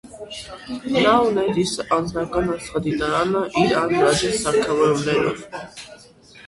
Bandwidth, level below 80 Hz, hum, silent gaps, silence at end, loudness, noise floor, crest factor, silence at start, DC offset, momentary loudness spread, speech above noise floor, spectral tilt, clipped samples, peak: 11.5 kHz; -46 dBFS; none; none; 0 s; -20 LUFS; -47 dBFS; 18 dB; 0.05 s; under 0.1%; 17 LU; 26 dB; -4.5 dB/octave; under 0.1%; -4 dBFS